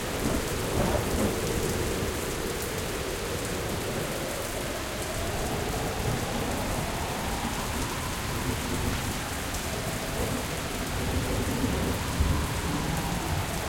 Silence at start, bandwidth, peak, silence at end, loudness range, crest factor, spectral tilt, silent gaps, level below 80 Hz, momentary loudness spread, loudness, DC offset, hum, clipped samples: 0 s; 17 kHz; -12 dBFS; 0 s; 2 LU; 18 dB; -4 dB/octave; none; -36 dBFS; 4 LU; -30 LUFS; under 0.1%; none; under 0.1%